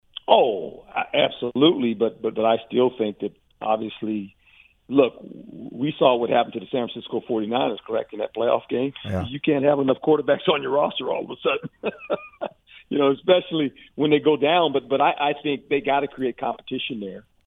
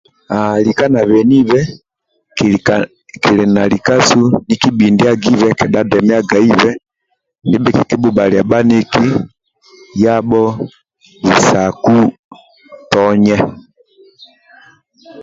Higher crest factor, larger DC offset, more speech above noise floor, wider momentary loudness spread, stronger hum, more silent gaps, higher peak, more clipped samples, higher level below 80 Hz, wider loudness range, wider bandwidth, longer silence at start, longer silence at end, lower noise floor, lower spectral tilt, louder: first, 22 dB vs 12 dB; neither; second, 33 dB vs 58 dB; first, 12 LU vs 9 LU; neither; second, none vs 12.19-12.31 s; about the same, -2 dBFS vs 0 dBFS; neither; second, -62 dBFS vs -44 dBFS; about the same, 4 LU vs 3 LU; second, 4 kHz vs 7.8 kHz; about the same, 0.3 s vs 0.3 s; first, 0.25 s vs 0 s; second, -56 dBFS vs -68 dBFS; first, -8 dB/octave vs -5.5 dB/octave; second, -23 LUFS vs -12 LUFS